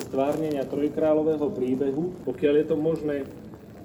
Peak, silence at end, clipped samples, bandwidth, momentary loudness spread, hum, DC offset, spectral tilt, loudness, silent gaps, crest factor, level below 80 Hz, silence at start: -10 dBFS; 0 s; under 0.1%; 19.5 kHz; 9 LU; none; under 0.1%; -7.5 dB/octave; -26 LUFS; none; 14 dB; -56 dBFS; 0 s